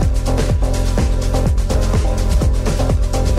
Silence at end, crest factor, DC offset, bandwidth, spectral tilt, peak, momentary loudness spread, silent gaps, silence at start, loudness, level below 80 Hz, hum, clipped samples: 0 s; 8 dB; under 0.1%; 13.5 kHz; -6 dB/octave; -6 dBFS; 1 LU; none; 0 s; -18 LUFS; -16 dBFS; none; under 0.1%